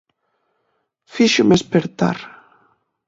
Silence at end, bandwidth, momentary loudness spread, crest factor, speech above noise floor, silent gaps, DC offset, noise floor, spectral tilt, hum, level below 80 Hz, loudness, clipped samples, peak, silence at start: 0.8 s; 8 kHz; 19 LU; 18 dB; 54 dB; none; under 0.1%; -70 dBFS; -5 dB/octave; none; -54 dBFS; -17 LUFS; under 0.1%; -2 dBFS; 1.15 s